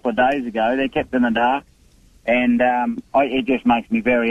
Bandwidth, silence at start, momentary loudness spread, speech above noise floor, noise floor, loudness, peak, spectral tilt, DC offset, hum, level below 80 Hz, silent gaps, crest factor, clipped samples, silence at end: 6.8 kHz; 0.05 s; 4 LU; 34 dB; -52 dBFS; -19 LUFS; -6 dBFS; -6.5 dB/octave; under 0.1%; none; -48 dBFS; none; 12 dB; under 0.1%; 0 s